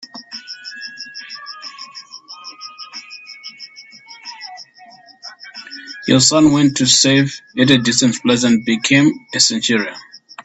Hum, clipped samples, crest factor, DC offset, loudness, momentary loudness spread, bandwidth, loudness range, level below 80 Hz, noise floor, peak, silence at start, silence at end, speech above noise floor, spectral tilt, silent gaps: none; under 0.1%; 18 dB; under 0.1%; -13 LUFS; 23 LU; 8.8 kHz; 20 LU; -54 dBFS; -44 dBFS; 0 dBFS; 0.15 s; 0.05 s; 30 dB; -3.5 dB/octave; none